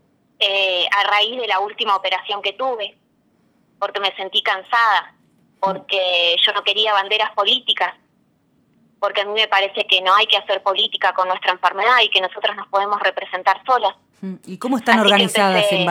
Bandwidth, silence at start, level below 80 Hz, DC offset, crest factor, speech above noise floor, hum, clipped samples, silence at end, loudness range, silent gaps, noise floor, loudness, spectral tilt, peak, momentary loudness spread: 16.5 kHz; 0.4 s; -78 dBFS; under 0.1%; 20 dB; 43 dB; none; under 0.1%; 0 s; 5 LU; none; -61 dBFS; -17 LUFS; -3 dB/octave; 0 dBFS; 10 LU